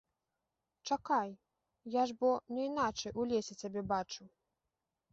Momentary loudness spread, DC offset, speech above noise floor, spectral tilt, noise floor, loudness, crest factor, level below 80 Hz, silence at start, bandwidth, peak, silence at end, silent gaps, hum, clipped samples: 12 LU; under 0.1%; 53 dB; -3.5 dB/octave; -89 dBFS; -36 LUFS; 18 dB; -70 dBFS; 0.85 s; 7.6 kHz; -20 dBFS; 0.85 s; none; none; under 0.1%